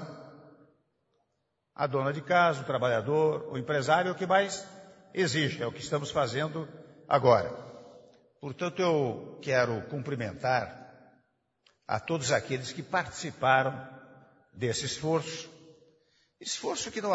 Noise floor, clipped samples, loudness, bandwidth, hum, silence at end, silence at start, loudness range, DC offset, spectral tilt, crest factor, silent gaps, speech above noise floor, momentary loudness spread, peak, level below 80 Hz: -79 dBFS; under 0.1%; -29 LUFS; 8 kHz; none; 0 s; 0 s; 5 LU; under 0.1%; -4.5 dB/octave; 22 dB; none; 50 dB; 18 LU; -8 dBFS; -66 dBFS